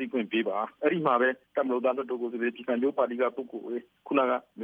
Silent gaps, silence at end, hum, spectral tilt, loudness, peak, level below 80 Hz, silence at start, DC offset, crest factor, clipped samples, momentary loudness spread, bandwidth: none; 0 s; none; -8 dB/octave; -29 LUFS; -10 dBFS; -84 dBFS; 0 s; under 0.1%; 18 dB; under 0.1%; 10 LU; 4.5 kHz